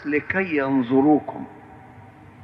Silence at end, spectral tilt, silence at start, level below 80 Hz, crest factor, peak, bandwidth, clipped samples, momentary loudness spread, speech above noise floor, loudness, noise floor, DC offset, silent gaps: 0 s; -9 dB/octave; 0 s; -58 dBFS; 16 dB; -8 dBFS; 5.2 kHz; under 0.1%; 18 LU; 24 dB; -21 LUFS; -45 dBFS; under 0.1%; none